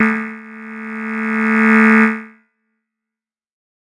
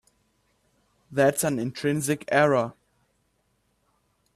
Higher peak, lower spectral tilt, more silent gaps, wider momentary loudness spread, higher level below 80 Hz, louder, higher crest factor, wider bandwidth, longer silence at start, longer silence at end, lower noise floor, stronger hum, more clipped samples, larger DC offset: first, -2 dBFS vs -8 dBFS; first, -7 dB/octave vs -5 dB/octave; neither; first, 20 LU vs 8 LU; about the same, -64 dBFS vs -66 dBFS; first, -14 LUFS vs -24 LUFS; about the same, 16 dB vs 20 dB; second, 10.5 kHz vs 14.5 kHz; second, 0 s vs 1.1 s; about the same, 1.55 s vs 1.65 s; first, -87 dBFS vs -71 dBFS; neither; neither; neither